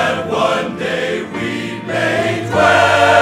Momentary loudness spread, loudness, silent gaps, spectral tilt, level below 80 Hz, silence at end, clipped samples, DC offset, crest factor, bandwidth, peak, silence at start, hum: 11 LU; -15 LUFS; none; -4.5 dB/octave; -50 dBFS; 0 s; under 0.1%; under 0.1%; 14 dB; 15.5 kHz; -2 dBFS; 0 s; none